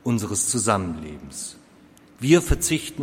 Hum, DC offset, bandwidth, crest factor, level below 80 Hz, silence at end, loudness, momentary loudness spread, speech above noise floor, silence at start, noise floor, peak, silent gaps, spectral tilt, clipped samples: none; under 0.1%; 16.5 kHz; 20 dB; -34 dBFS; 0 s; -22 LUFS; 16 LU; 29 dB; 0.05 s; -51 dBFS; -4 dBFS; none; -4.5 dB/octave; under 0.1%